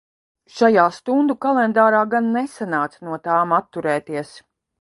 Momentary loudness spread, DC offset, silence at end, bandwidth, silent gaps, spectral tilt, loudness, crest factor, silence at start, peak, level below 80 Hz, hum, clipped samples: 14 LU; under 0.1%; 0.45 s; 11.5 kHz; none; -6.5 dB/octave; -19 LUFS; 20 dB; 0.55 s; 0 dBFS; -66 dBFS; none; under 0.1%